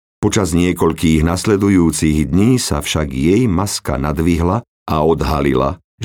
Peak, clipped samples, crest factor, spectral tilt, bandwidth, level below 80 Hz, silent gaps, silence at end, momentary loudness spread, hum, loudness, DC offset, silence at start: -2 dBFS; under 0.1%; 14 dB; -5.5 dB/octave; 19 kHz; -30 dBFS; 4.68-4.86 s, 5.84-5.98 s; 0 s; 6 LU; none; -15 LUFS; under 0.1%; 0.2 s